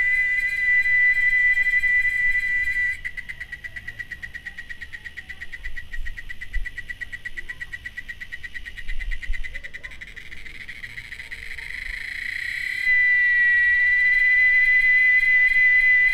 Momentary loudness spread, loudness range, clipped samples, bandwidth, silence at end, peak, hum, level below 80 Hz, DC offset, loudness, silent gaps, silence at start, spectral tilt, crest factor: 21 LU; 19 LU; under 0.1%; 13.5 kHz; 0 s; -10 dBFS; none; -38 dBFS; under 0.1%; -17 LUFS; none; 0 s; -1.5 dB/octave; 12 dB